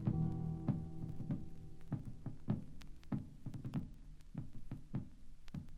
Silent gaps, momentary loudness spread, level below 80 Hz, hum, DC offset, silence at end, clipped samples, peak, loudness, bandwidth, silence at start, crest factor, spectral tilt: none; 16 LU; -54 dBFS; none; under 0.1%; 0 s; under 0.1%; -24 dBFS; -45 LUFS; 9.6 kHz; 0 s; 18 dB; -9.5 dB/octave